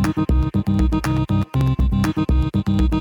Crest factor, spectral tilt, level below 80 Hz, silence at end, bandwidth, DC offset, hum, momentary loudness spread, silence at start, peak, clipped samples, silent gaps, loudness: 12 dB; -7.5 dB/octave; -22 dBFS; 0 s; 17 kHz; under 0.1%; none; 1 LU; 0 s; -6 dBFS; under 0.1%; none; -20 LUFS